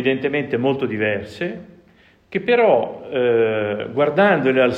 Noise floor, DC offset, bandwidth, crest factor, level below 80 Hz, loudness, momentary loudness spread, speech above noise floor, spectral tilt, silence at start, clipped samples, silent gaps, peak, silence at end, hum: -53 dBFS; under 0.1%; 8 kHz; 16 dB; -62 dBFS; -19 LUFS; 12 LU; 35 dB; -7.5 dB/octave; 0 s; under 0.1%; none; -2 dBFS; 0 s; none